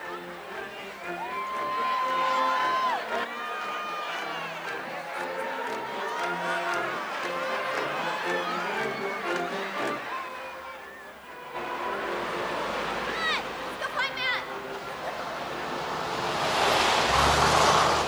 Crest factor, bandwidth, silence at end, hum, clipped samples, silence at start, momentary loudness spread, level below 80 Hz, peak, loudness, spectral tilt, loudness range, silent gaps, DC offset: 22 dB; over 20 kHz; 0 s; none; under 0.1%; 0 s; 15 LU; -50 dBFS; -8 dBFS; -28 LUFS; -3 dB/octave; 6 LU; none; under 0.1%